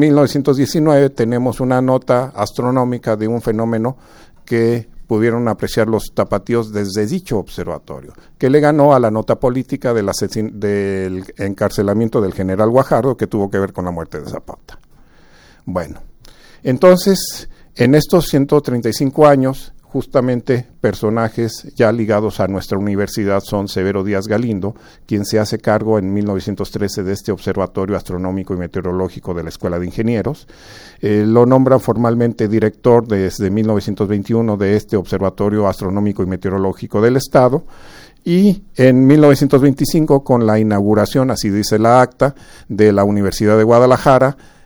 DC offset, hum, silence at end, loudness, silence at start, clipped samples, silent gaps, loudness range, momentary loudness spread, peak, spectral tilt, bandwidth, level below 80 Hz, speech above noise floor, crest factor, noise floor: under 0.1%; none; 0.3 s; -15 LUFS; 0 s; under 0.1%; none; 7 LU; 12 LU; 0 dBFS; -7 dB/octave; over 20 kHz; -40 dBFS; 30 dB; 14 dB; -45 dBFS